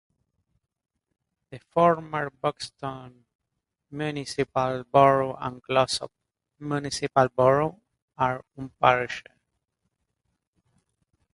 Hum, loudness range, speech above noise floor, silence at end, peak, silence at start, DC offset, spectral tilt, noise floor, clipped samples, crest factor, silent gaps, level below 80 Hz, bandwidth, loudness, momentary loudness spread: none; 5 LU; 57 dB; 2.15 s; -2 dBFS; 1.5 s; under 0.1%; -5 dB/octave; -82 dBFS; under 0.1%; 26 dB; 3.35-3.39 s, 8.02-8.08 s; -60 dBFS; 11.5 kHz; -25 LUFS; 16 LU